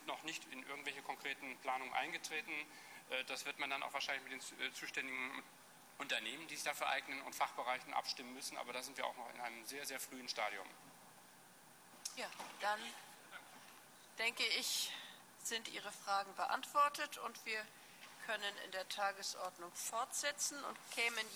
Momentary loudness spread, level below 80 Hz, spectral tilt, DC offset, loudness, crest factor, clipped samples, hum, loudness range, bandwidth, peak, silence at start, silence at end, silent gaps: 17 LU; under -90 dBFS; 0 dB/octave; under 0.1%; -42 LUFS; 22 dB; under 0.1%; none; 6 LU; 19 kHz; -22 dBFS; 0 s; 0 s; none